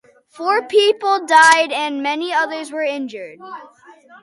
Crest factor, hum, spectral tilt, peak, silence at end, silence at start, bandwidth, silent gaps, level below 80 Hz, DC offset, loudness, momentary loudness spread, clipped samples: 18 dB; none; -0.5 dB/octave; 0 dBFS; 0.55 s; 0.35 s; 11.5 kHz; none; -72 dBFS; under 0.1%; -16 LUFS; 23 LU; under 0.1%